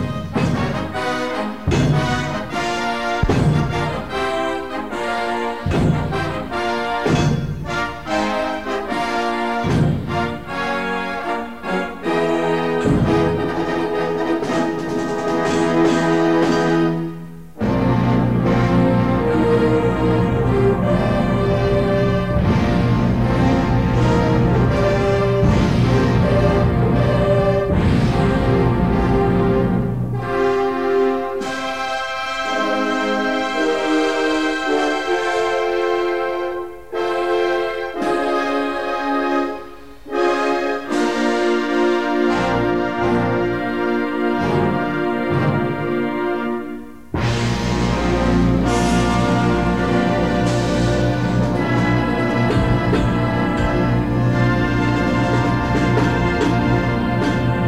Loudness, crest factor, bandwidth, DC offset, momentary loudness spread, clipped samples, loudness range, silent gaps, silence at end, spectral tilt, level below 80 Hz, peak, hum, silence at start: -18 LUFS; 14 dB; 12.5 kHz; 1%; 7 LU; under 0.1%; 4 LU; none; 0 s; -7 dB/octave; -32 dBFS; -4 dBFS; none; 0 s